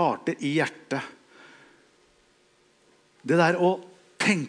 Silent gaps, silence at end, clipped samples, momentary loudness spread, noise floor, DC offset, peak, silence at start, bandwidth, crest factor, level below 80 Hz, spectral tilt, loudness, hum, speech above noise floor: none; 0 s; under 0.1%; 12 LU; -63 dBFS; under 0.1%; -8 dBFS; 0 s; 10.5 kHz; 20 dB; -78 dBFS; -5.5 dB/octave; -25 LUFS; none; 38 dB